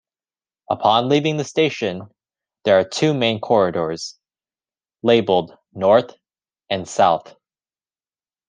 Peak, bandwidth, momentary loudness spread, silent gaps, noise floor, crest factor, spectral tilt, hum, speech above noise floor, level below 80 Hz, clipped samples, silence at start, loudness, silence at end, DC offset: -2 dBFS; 9.8 kHz; 11 LU; none; under -90 dBFS; 20 dB; -5 dB/octave; none; over 72 dB; -66 dBFS; under 0.1%; 0.7 s; -19 LUFS; 1.3 s; under 0.1%